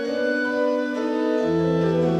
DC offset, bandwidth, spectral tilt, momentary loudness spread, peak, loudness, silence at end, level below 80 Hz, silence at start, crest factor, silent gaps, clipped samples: under 0.1%; 8.8 kHz; -7.5 dB/octave; 3 LU; -10 dBFS; -22 LUFS; 0 s; -54 dBFS; 0 s; 12 dB; none; under 0.1%